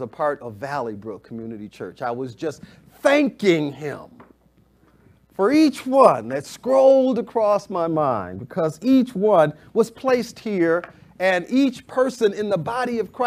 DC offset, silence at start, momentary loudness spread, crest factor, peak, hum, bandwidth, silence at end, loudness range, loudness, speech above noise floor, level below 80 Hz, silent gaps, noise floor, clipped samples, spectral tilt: under 0.1%; 0 s; 16 LU; 20 dB; 0 dBFS; none; 15 kHz; 0 s; 6 LU; -20 LUFS; 38 dB; -62 dBFS; none; -58 dBFS; under 0.1%; -6 dB/octave